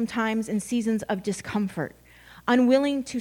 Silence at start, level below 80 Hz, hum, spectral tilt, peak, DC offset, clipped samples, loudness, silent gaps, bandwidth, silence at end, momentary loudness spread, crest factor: 0 s; -58 dBFS; none; -5.5 dB/octave; -8 dBFS; under 0.1%; under 0.1%; -25 LUFS; none; 18 kHz; 0 s; 11 LU; 18 dB